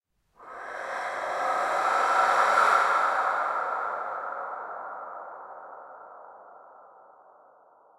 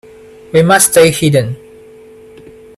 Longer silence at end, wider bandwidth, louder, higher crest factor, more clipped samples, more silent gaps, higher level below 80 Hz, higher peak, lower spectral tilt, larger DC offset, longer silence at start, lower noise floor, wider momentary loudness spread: about the same, 1.1 s vs 1.2 s; second, 14 kHz vs 20 kHz; second, -26 LUFS vs -9 LUFS; first, 20 dB vs 14 dB; neither; neither; second, -76 dBFS vs -46 dBFS; second, -10 dBFS vs 0 dBFS; second, -1 dB/octave vs -4 dB/octave; neither; second, 0.4 s vs 0.55 s; first, -58 dBFS vs -37 dBFS; first, 24 LU vs 14 LU